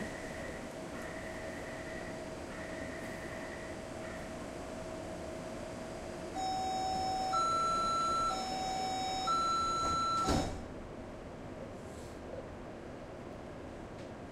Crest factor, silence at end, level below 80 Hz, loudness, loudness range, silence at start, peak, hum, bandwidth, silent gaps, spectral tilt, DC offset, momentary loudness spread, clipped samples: 18 dB; 0 s; -54 dBFS; -38 LUFS; 10 LU; 0 s; -20 dBFS; none; 15.5 kHz; none; -4 dB/octave; under 0.1%; 15 LU; under 0.1%